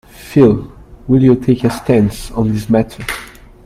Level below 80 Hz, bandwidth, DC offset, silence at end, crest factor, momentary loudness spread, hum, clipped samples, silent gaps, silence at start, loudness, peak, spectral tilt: -36 dBFS; 15.5 kHz; under 0.1%; 0.35 s; 14 dB; 13 LU; none; under 0.1%; none; 0.2 s; -14 LUFS; 0 dBFS; -7.5 dB/octave